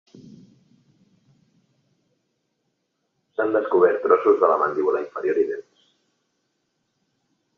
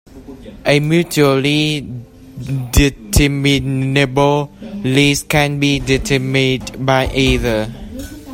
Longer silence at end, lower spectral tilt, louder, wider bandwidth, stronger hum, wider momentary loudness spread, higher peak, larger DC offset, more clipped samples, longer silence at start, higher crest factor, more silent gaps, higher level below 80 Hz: first, 1.95 s vs 0 s; first, -7.5 dB/octave vs -5 dB/octave; second, -21 LUFS vs -15 LUFS; second, 6.2 kHz vs 16.5 kHz; neither; second, 9 LU vs 15 LU; about the same, -2 dBFS vs 0 dBFS; neither; neither; about the same, 0.25 s vs 0.15 s; first, 22 dB vs 16 dB; neither; second, -74 dBFS vs -28 dBFS